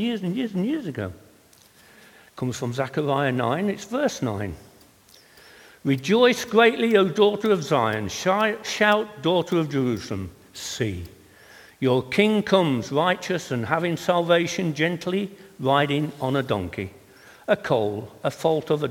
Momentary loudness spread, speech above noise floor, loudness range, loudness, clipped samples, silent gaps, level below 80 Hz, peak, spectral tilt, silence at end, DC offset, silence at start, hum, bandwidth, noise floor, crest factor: 13 LU; 32 dB; 6 LU; -23 LUFS; under 0.1%; none; -58 dBFS; -4 dBFS; -5.5 dB/octave; 0 s; under 0.1%; 0 s; none; 18.5 kHz; -54 dBFS; 20 dB